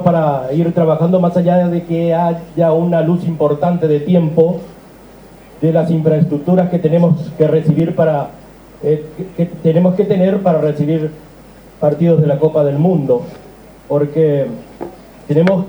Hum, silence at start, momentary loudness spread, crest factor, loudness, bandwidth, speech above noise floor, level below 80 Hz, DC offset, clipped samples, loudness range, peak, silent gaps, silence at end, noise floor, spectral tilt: none; 0 s; 8 LU; 14 dB; -14 LUFS; over 20 kHz; 26 dB; -48 dBFS; under 0.1%; under 0.1%; 2 LU; 0 dBFS; none; 0 s; -39 dBFS; -10 dB/octave